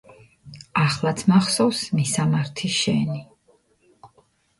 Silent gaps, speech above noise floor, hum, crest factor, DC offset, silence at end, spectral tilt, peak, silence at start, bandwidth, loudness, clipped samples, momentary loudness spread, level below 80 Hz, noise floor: none; 40 dB; none; 18 dB; under 0.1%; 0.55 s; -5 dB/octave; -6 dBFS; 0.45 s; 11.5 kHz; -21 LUFS; under 0.1%; 7 LU; -58 dBFS; -61 dBFS